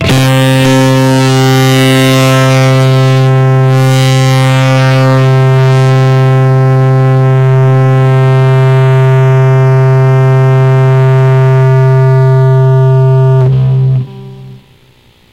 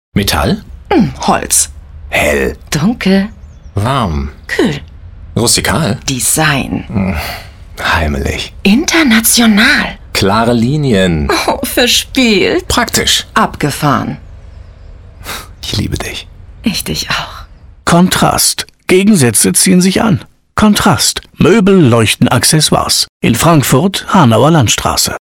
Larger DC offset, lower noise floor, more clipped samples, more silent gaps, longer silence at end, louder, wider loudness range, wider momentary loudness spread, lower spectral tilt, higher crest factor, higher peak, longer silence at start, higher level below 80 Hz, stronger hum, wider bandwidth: neither; first, -44 dBFS vs -33 dBFS; neither; second, none vs 23.09-23.20 s; first, 0.75 s vs 0.05 s; first, -7 LUFS vs -10 LUFS; second, 0 LU vs 6 LU; second, 1 LU vs 11 LU; first, -6.5 dB/octave vs -4 dB/octave; second, 4 dB vs 12 dB; about the same, -2 dBFS vs 0 dBFS; second, 0 s vs 0.15 s; second, -40 dBFS vs -28 dBFS; neither; second, 14.5 kHz vs 19.5 kHz